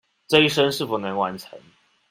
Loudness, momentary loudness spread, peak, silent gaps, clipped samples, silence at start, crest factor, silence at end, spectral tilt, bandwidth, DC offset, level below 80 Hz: -21 LUFS; 10 LU; -2 dBFS; none; under 0.1%; 0.3 s; 22 dB; 0.5 s; -4.5 dB/octave; 16 kHz; under 0.1%; -60 dBFS